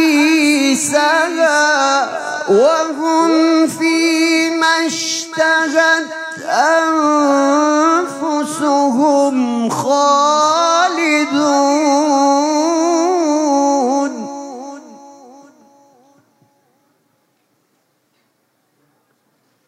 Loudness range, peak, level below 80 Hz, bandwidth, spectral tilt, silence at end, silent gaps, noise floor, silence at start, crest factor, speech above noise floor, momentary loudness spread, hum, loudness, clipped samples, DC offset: 5 LU; 0 dBFS; -74 dBFS; 14.5 kHz; -2.5 dB/octave; 4.55 s; none; -63 dBFS; 0 s; 14 dB; 51 dB; 7 LU; none; -13 LUFS; under 0.1%; under 0.1%